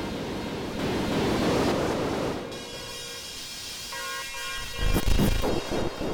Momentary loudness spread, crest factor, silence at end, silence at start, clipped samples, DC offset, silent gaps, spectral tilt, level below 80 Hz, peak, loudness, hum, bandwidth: 10 LU; 16 dB; 0 s; 0 s; under 0.1%; under 0.1%; none; -4.5 dB/octave; -34 dBFS; -12 dBFS; -29 LUFS; none; over 20 kHz